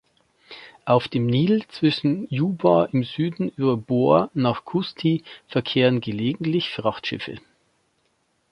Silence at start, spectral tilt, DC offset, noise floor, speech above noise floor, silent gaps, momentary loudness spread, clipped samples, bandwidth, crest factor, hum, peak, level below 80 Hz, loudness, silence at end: 0.5 s; -8.5 dB/octave; under 0.1%; -68 dBFS; 47 dB; none; 10 LU; under 0.1%; 10.5 kHz; 20 dB; none; -2 dBFS; -60 dBFS; -22 LUFS; 1.15 s